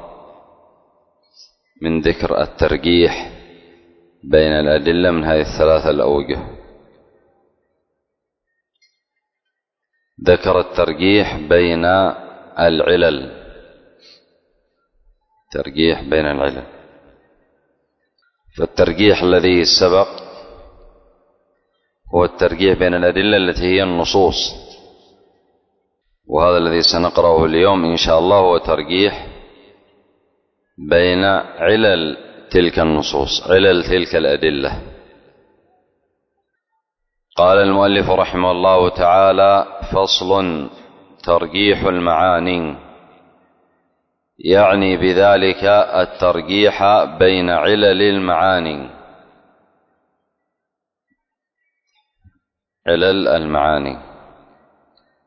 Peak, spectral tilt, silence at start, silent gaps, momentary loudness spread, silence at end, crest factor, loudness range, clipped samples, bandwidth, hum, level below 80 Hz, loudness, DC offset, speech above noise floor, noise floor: 0 dBFS; -5 dB/octave; 0 s; none; 12 LU; 1.25 s; 16 dB; 8 LU; under 0.1%; 6.4 kHz; none; -38 dBFS; -14 LUFS; under 0.1%; 66 dB; -80 dBFS